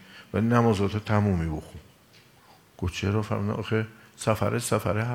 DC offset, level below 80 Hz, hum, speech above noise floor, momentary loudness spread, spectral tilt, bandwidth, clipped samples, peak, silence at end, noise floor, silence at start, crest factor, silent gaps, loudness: under 0.1%; -52 dBFS; none; 31 dB; 11 LU; -6.5 dB/octave; 16 kHz; under 0.1%; -6 dBFS; 0 s; -56 dBFS; 0.1 s; 22 dB; none; -27 LUFS